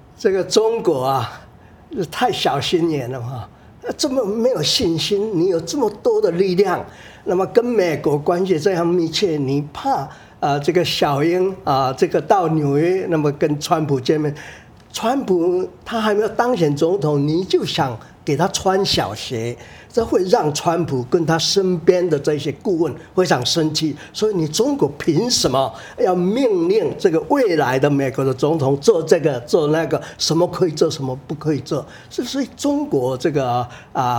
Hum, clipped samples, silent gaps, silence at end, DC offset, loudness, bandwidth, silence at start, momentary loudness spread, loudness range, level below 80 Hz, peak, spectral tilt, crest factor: none; under 0.1%; none; 0 s; under 0.1%; -18 LUFS; 18.5 kHz; 0.2 s; 8 LU; 3 LU; -50 dBFS; 0 dBFS; -5 dB/octave; 18 dB